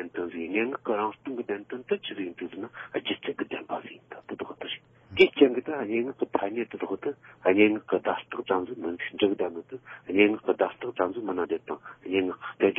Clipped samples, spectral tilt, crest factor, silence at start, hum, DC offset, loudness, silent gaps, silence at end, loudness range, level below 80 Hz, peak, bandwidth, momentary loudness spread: under 0.1%; -3 dB/octave; 22 dB; 0 s; none; under 0.1%; -28 LUFS; none; 0 s; 9 LU; -70 dBFS; -6 dBFS; 5.8 kHz; 15 LU